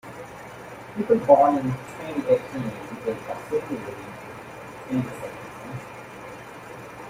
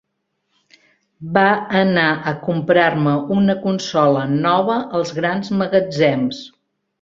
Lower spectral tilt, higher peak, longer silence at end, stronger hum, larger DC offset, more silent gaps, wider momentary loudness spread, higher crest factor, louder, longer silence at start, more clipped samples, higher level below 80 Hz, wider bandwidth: about the same, -7 dB/octave vs -6.5 dB/octave; about the same, -2 dBFS vs 0 dBFS; second, 0 s vs 0.55 s; neither; neither; neither; first, 21 LU vs 7 LU; first, 24 dB vs 18 dB; second, -24 LUFS vs -17 LUFS; second, 0.05 s vs 1.2 s; neither; about the same, -60 dBFS vs -58 dBFS; first, 16 kHz vs 7.6 kHz